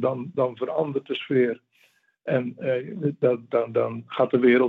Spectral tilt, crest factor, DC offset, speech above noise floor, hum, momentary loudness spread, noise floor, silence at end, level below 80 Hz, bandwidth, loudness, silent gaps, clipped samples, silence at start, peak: -9 dB/octave; 18 dB; under 0.1%; 40 dB; none; 6 LU; -63 dBFS; 0 s; -76 dBFS; 4.4 kHz; -25 LUFS; none; under 0.1%; 0 s; -6 dBFS